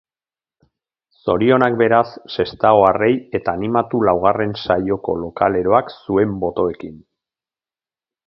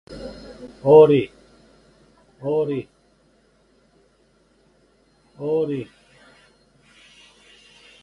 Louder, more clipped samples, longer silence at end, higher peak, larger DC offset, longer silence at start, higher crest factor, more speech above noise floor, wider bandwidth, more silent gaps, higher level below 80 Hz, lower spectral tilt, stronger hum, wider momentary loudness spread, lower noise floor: about the same, -17 LUFS vs -19 LUFS; neither; second, 1.3 s vs 2.2 s; about the same, 0 dBFS vs -2 dBFS; neither; first, 1.25 s vs 0.1 s; about the same, 18 dB vs 22 dB; first, over 73 dB vs 43 dB; about the same, 6 kHz vs 6 kHz; neither; first, -48 dBFS vs -58 dBFS; about the same, -9 dB/octave vs -8.5 dB/octave; neither; second, 9 LU vs 26 LU; first, under -90 dBFS vs -60 dBFS